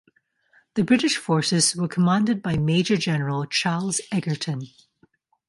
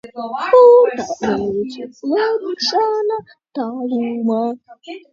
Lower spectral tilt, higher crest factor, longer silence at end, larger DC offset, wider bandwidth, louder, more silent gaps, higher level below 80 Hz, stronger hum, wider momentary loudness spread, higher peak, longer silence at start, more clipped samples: about the same, -4.5 dB/octave vs -4.5 dB/octave; about the same, 18 dB vs 16 dB; first, 0.8 s vs 0.15 s; neither; first, 11.5 kHz vs 7.4 kHz; second, -22 LUFS vs -16 LUFS; neither; about the same, -56 dBFS vs -58 dBFS; neither; second, 8 LU vs 18 LU; second, -6 dBFS vs 0 dBFS; first, 0.75 s vs 0.05 s; neither